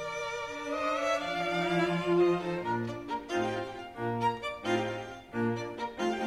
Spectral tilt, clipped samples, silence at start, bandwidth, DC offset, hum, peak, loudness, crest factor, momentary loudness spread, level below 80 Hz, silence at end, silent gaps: -5.5 dB/octave; under 0.1%; 0 s; 12.5 kHz; under 0.1%; none; -16 dBFS; -32 LUFS; 16 dB; 9 LU; -62 dBFS; 0 s; none